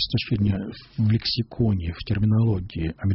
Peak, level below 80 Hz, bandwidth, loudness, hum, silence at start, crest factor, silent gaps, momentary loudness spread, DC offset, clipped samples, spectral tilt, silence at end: -10 dBFS; -40 dBFS; 5.8 kHz; -24 LUFS; none; 0 s; 12 dB; none; 7 LU; under 0.1%; under 0.1%; -6.5 dB/octave; 0 s